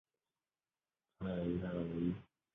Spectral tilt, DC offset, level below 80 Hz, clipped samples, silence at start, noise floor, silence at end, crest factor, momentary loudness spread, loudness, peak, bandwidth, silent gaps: -8 dB/octave; under 0.1%; -62 dBFS; under 0.1%; 1.2 s; under -90 dBFS; 0.3 s; 18 dB; 7 LU; -41 LUFS; -26 dBFS; 3.9 kHz; none